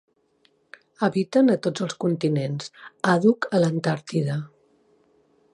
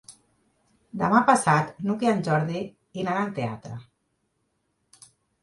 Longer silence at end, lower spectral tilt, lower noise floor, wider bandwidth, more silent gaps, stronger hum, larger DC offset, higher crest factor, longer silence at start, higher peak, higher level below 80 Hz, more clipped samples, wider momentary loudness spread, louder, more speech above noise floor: second, 1.05 s vs 1.6 s; about the same, -6.5 dB/octave vs -6 dB/octave; second, -65 dBFS vs -74 dBFS; about the same, 11.5 kHz vs 11.5 kHz; neither; neither; neither; about the same, 18 dB vs 22 dB; first, 1 s vs 0.1 s; about the same, -6 dBFS vs -6 dBFS; second, -70 dBFS vs -64 dBFS; neither; second, 11 LU vs 19 LU; about the same, -23 LUFS vs -24 LUFS; second, 42 dB vs 50 dB